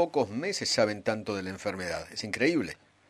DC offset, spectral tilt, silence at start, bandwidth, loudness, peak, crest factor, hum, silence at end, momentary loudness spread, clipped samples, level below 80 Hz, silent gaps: under 0.1%; -4 dB/octave; 0 s; 15.5 kHz; -30 LUFS; -10 dBFS; 20 dB; none; 0.35 s; 8 LU; under 0.1%; -64 dBFS; none